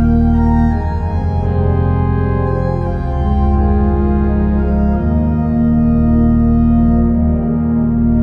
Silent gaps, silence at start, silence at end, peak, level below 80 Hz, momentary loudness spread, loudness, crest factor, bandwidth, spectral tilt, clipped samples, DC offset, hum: none; 0 s; 0 s; -2 dBFS; -18 dBFS; 5 LU; -14 LUFS; 10 dB; 4.4 kHz; -11.5 dB/octave; under 0.1%; under 0.1%; none